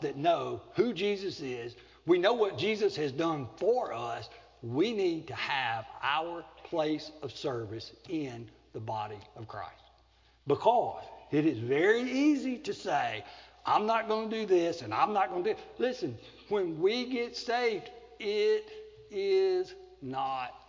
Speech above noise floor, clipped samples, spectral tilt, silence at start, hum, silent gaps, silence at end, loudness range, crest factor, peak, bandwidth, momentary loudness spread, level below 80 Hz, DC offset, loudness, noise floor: 33 dB; under 0.1%; -5.5 dB/octave; 0 s; none; none; 0.1 s; 6 LU; 20 dB; -12 dBFS; 7.6 kHz; 16 LU; -66 dBFS; under 0.1%; -31 LUFS; -64 dBFS